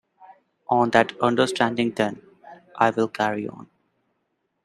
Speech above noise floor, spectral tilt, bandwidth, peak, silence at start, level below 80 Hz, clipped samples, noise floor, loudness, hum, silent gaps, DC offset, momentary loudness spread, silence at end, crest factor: 53 dB; -5 dB/octave; 14 kHz; -2 dBFS; 0.7 s; -66 dBFS; under 0.1%; -74 dBFS; -22 LUFS; none; none; under 0.1%; 13 LU; 1 s; 24 dB